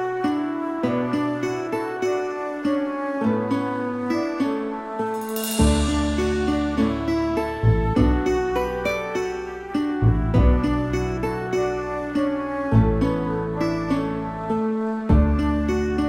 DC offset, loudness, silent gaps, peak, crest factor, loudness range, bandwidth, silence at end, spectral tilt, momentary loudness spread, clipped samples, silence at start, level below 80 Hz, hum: under 0.1%; -23 LUFS; none; -4 dBFS; 18 dB; 3 LU; 16 kHz; 0 s; -7 dB/octave; 7 LU; under 0.1%; 0 s; -30 dBFS; none